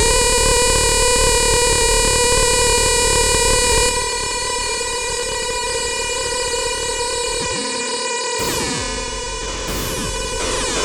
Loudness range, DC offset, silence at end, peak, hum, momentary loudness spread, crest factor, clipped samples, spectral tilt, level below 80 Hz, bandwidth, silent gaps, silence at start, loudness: 7 LU; under 0.1%; 0 s; -4 dBFS; none; 8 LU; 14 dB; under 0.1%; -1.5 dB/octave; -28 dBFS; over 20 kHz; none; 0 s; -16 LUFS